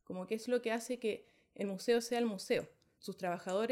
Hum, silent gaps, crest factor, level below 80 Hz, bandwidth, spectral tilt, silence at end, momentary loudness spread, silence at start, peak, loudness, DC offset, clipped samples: none; none; 16 dB; -82 dBFS; 16 kHz; -4.5 dB/octave; 0 s; 12 LU; 0.1 s; -20 dBFS; -37 LUFS; under 0.1%; under 0.1%